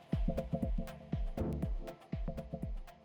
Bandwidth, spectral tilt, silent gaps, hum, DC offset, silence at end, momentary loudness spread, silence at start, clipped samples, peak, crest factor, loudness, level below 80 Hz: 18.5 kHz; -8.5 dB/octave; none; none; under 0.1%; 0 s; 7 LU; 0 s; under 0.1%; -24 dBFS; 14 dB; -41 LUFS; -40 dBFS